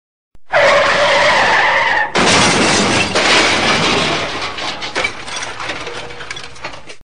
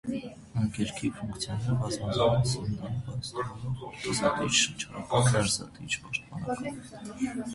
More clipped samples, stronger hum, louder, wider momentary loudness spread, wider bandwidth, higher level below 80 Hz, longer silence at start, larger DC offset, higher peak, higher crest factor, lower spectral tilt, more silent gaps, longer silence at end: neither; neither; first, -12 LUFS vs -30 LUFS; first, 17 LU vs 12 LU; second, 10 kHz vs 11.5 kHz; first, -44 dBFS vs -52 dBFS; first, 0.3 s vs 0.05 s; first, 3% vs under 0.1%; first, 0 dBFS vs -10 dBFS; second, 14 dB vs 20 dB; second, -2.5 dB/octave vs -4.5 dB/octave; neither; about the same, 0.1 s vs 0 s